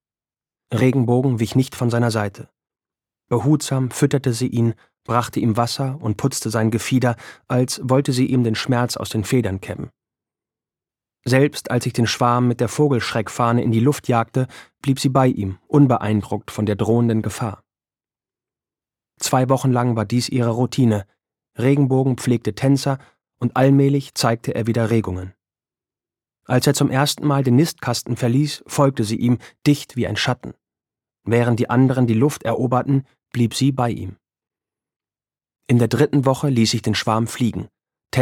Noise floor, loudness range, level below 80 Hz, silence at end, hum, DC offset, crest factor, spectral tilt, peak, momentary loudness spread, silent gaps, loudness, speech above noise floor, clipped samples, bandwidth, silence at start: under -90 dBFS; 3 LU; -56 dBFS; 0 s; none; under 0.1%; 18 dB; -6 dB/octave; -2 dBFS; 9 LU; 34.96-35.00 s; -19 LUFS; over 72 dB; under 0.1%; 16.5 kHz; 0.7 s